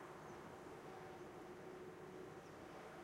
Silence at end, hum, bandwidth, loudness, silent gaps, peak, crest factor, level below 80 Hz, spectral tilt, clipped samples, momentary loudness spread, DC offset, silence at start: 0 s; none; 16 kHz; -56 LUFS; none; -44 dBFS; 12 dB; -78 dBFS; -5.5 dB/octave; under 0.1%; 1 LU; under 0.1%; 0 s